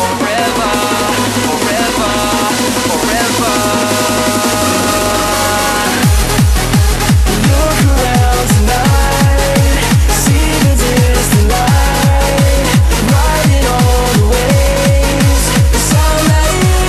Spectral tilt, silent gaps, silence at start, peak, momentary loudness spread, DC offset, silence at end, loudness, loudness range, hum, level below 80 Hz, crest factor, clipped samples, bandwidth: -4.5 dB/octave; none; 0 s; 0 dBFS; 2 LU; under 0.1%; 0 s; -11 LUFS; 2 LU; none; -16 dBFS; 10 dB; under 0.1%; 13.5 kHz